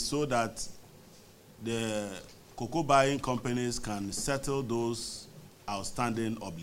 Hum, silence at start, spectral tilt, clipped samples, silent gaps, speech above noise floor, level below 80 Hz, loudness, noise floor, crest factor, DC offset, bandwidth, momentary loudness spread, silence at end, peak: none; 0 s; -4.5 dB/octave; under 0.1%; none; 24 dB; -52 dBFS; -32 LUFS; -55 dBFS; 24 dB; under 0.1%; 16 kHz; 16 LU; 0 s; -10 dBFS